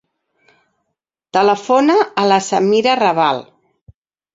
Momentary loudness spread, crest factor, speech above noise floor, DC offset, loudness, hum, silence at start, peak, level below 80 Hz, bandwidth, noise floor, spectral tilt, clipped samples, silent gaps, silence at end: 4 LU; 16 dB; 62 dB; under 0.1%; -14 LUFS; none; 1.35 s; 0 dBFS; -60 dBFS; 7.8 kHz; -76 dBFS; -4.5 dB/octave; under 0.1%; none; 0.9 s